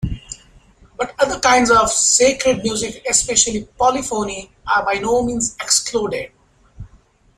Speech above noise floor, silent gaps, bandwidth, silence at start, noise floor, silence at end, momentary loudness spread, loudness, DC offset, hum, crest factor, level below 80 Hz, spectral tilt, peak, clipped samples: 35 dB; none; 15.5 kHz; 0 s; -52 dBFS; 0.5 s; 15 LU; -16 LUFS; under 0.1%; none; 18 dB; -40 dBFS; -2 dB/octave; 0 dBFS; under 0.1%